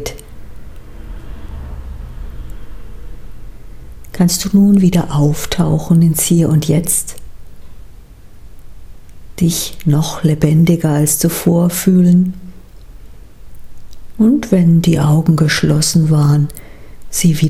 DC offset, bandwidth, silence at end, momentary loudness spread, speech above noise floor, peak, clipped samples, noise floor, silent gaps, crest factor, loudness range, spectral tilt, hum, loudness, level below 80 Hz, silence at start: under 0.1%; 16 kHz; 0 s; 21 LU; 23 dB; 0 dBFS; under 0.1%; -35 dBFS; none; 14 dB; 10 LU; -5.5 dB/octave; none; -13 LUFS; -34 dBFS; 0 s